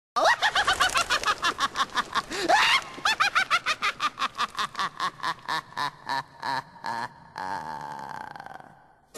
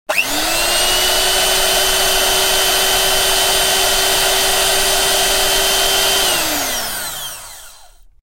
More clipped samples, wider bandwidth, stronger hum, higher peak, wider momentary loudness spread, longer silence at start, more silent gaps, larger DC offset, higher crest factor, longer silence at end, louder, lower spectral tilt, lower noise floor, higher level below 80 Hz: neither; second, 13 kHz vs 16.5 kHz; neither; second, -8 dBFS vs -2 dBFS; first, 15 LU vs 7 LU; about the same, 0.15 s vs 0.1 s; neither; neither; about the same, 18 dB vs 14 dB; second, 0 s vs 0.35 s; second, -26 LUFS vs -13 LUFS; about the same, -1 dB/octave vs 0 dB/octave; first, -54 dBFS vs -42 dBFS; second, -58 dBFS vs -32 dBFS